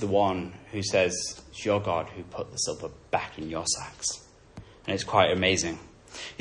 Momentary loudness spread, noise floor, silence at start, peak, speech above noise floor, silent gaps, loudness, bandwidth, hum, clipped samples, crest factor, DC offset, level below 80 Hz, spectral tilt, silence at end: 16 LU; -49 dBFS; 0 s; -6 dBFS; 20 dB; none; -28 LUFS; 11.5 kHz; none; under 0.1%; 22 dB; under 0.1%; -56 dBFS; -3 dB/octave; 0.05 s